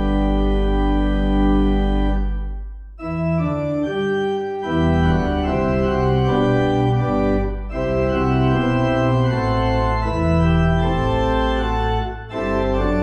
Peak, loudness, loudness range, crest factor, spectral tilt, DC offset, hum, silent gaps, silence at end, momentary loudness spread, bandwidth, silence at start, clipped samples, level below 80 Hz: -6 dBFS; -19 LUFS; 3 LU; 12 dB; -8.5 dB/octave; under 0.1%; none; none; 0 s; 7 LU; 8.4 kHz; 0 s; under 0.1%; -24 dBFS